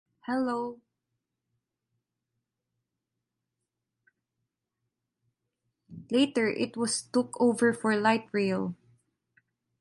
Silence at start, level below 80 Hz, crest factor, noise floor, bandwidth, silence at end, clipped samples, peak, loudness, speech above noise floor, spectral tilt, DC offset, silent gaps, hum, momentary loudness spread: 0.3 s; -74 dBFS; 22 dB; -86 dBFS; 11.5 kHz; 1.05 s; under 0.1%; -10 dBFS; -28 LUFS; 58 dB; -4.5 dB/octave; under 0.1%; none; none; 9 LU